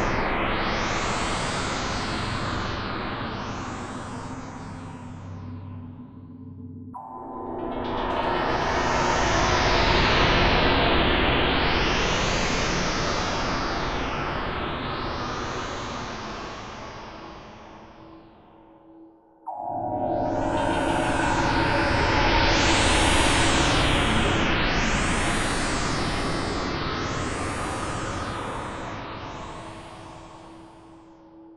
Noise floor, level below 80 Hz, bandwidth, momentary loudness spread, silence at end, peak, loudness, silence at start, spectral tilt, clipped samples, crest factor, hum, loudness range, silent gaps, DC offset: -51 dBFS; -34 dBFS; 12 kHz; 19 LU; 0 s; -6 dBFS; -24 LUFS; 0 s; -4 dB/octave; under 0.1%; 20 dB; none; 16 LU; none; under 0.1%